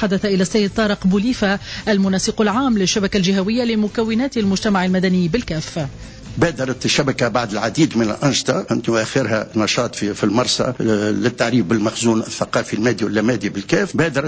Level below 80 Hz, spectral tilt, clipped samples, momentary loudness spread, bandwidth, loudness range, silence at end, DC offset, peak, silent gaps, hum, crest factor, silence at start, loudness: -42 dBFS; -5 dB/octave; under 0.1%; 4 LU; 8 kHz; 2 LU; 0 s; under 0.1%; -4 dBFS; none; none; 14 dB; 0 s; -18 LUFS